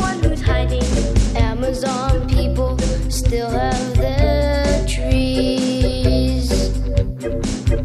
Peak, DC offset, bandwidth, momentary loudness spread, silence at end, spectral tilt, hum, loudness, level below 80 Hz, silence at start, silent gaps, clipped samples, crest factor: -2 dBFS; under 0.1%; 13.5 kHz; 4 LU; 0 s; -6 dB/octave; none; -19 LUFS; -20 dBFS; 0 s; none; under 0.1%; 14 dB